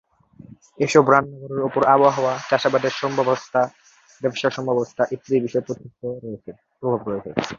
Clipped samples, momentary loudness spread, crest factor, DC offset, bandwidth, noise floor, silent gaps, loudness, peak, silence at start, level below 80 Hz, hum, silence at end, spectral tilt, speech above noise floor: under 0.1%; 15 LU; 20 dB; under 0.1%; 7.8 kHz; -46 dBFS; none; -21 LUFS; -2 dBFS; 0.8 s; -62 dBFS; none; 0 s; -5.5 dB/octave; 25 dB